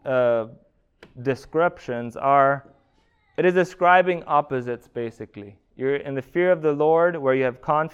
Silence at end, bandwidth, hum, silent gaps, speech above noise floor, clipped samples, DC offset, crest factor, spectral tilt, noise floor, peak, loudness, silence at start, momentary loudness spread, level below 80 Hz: 0.05 s; 10 kHz; none; none; 42 dB; under 0.1%; under 0.1%; 20 dB; -7 dB/octave; -63 dBFS; -4 dBFS; -22 LUFS; 0.05 s; 14 LU; -60 dBFS